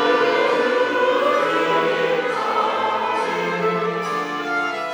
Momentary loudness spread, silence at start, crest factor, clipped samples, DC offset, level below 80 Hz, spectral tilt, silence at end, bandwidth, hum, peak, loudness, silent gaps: 5 LU; 0 s; 14 dB; under 0.1%; under 0.1%; -74 dBFS; -4.5 dB/octave; 0 s; over 20 kHz; none; -6 dBFS; -20 LUFS; none